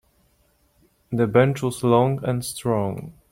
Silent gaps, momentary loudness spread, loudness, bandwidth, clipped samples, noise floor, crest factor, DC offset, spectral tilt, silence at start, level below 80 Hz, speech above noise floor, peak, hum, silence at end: none; 11 LU; -22 LUFS; 16.5 kHz; under 0.1%; -63 dBFS; 20 dB; under 0.1%; -6.5 dB/octave; 1.1 s; -54 dBFS; 42 dB; -4 dBFS; none; 0.2 s